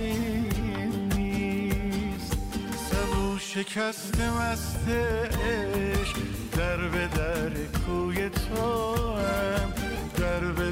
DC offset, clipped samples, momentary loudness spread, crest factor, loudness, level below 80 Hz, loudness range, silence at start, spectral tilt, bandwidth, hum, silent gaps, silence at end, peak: under 0.1%; under 0.1%; 4 LU; 12 dB; -29 LUFS; -36 dBFS; 1 LU; 0 s; -5.5 dB/octave; 16 kHz; none; none; 0 s; -16 dBFS